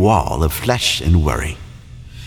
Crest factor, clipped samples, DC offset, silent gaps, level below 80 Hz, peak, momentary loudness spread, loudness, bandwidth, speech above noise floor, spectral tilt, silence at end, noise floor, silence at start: 16 dB; under 0.1%; under 0.1%; none; -26 dBFS; 0 dBFS; 20 LU; -17 LUFS; 18.5 kHz; 20 dB; -5 dB/octave; 0 s; -36 dBFS; 0 s